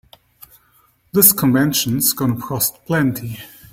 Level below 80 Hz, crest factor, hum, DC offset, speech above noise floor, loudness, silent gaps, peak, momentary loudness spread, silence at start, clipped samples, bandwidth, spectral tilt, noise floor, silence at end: -52 dBFS; 18 dB; none; under 0.1%; 40 dB; -16 LUFS; none; 0 dBFS; 14 LU; 1.15 s; under 0.1%; 16.5 kHz; -4 dB/octave; -57 dBFS; 0.25 s